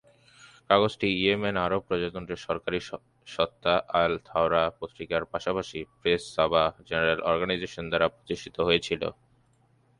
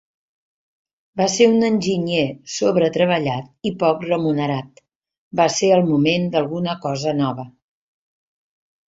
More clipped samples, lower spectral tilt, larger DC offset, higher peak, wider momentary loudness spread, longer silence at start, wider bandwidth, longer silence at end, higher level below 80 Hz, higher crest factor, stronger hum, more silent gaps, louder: neither; about the same, -5 dB/octave vs -5 dB/octave; neither; second, -6 dBFS vs -2 dBFS; about the same, 10 LU vs 10 LU; second, 0.45 s vs 1.15 s; first, 11 kHz vs 8 kHz; second, 0.85 s vs 1.4 s; first, -54 dBFS vs -60 dBFS; about the same, 22 dB vs 18 dB; neither; second, none vs 4.96-5.00 s, 5.18-5.31 s; second, -27 LUFS vs -19 LUFS